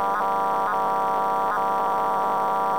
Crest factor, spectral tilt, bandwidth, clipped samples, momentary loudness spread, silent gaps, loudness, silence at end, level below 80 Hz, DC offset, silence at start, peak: 10 dB; -5 dB/octave; over 20 kHz; under 0.1%; 0 LU; none; -23 LUFS; 0 s; -58 dBFS; 0.6%; 0 s; -12 dBFS